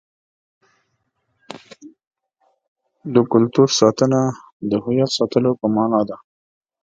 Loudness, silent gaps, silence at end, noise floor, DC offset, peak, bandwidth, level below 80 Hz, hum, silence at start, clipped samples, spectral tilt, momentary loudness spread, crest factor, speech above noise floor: -18 LUFS; 2.07-2.11 s, 2.68-2.76 s, 4.53-4.60 s; 0.7 s; -70 dBFS; under 0.1%; 0 dBFS; 9.2 kHz; -60 dBFS; none; 1.5 s; under 0.1%; -5.5 dB/octave; 22 LU; 20 dB; 53 dB